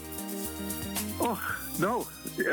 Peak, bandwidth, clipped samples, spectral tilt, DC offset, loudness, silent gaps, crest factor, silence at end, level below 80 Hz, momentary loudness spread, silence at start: -16 dBFS; 19 kHz; under 0.1%; -4 dB/octave; under 0.1%; -32 LUFS; none; 18 dB; 0 s; -52 dBFS; 5 LU; 0 s